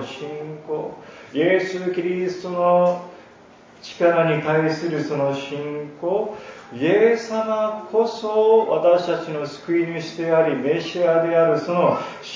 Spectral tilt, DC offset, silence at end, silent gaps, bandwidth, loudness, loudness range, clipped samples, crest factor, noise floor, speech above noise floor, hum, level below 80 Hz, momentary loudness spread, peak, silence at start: -6.5 dB/octave; under 0.1%; 0 s; none; 7.6 kHz; -21 LUFS; 3 LU; under 0.1%; 16 dB; -47 dBFS; 27 dB; none; -68 dBFS; 13 LU; -4 dBFS; 0 s